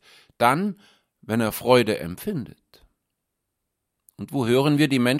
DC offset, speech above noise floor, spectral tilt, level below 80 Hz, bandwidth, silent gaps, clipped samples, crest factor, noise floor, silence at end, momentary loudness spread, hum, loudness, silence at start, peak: under 0.1%; 59 dB; -5.5 dB/octave; -58 dBFS; 16.5 kHz; none; under 0.1%; 22 dB; -80 dBFS; 0 s; 14 LU; none; -22 LUFS; 0.4 s; -2 dBFS